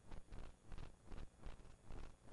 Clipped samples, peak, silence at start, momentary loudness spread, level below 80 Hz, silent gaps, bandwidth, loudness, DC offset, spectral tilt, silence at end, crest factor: under 0.1%; -40 dBFS; 0 s; 2 LU; -56 dBFS; none; 11 kHz; -61 LUFS; under 0.1%; -5.5 dB/octave; 0 s; 12 dB